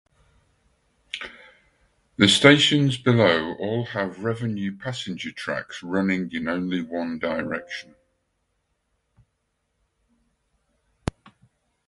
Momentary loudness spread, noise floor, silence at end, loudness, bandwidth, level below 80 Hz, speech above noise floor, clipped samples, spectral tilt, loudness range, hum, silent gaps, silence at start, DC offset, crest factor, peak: 19 LU; -74 dBFS; 4.05 s; -22 LUFS; 11.5 kHz; -54 dBFS; 52 dB; under 0.1%; -4.5 dB/octave; 20 LU; none; none; 1.15 s; under 0.1%; 26 dB; 0 dBFS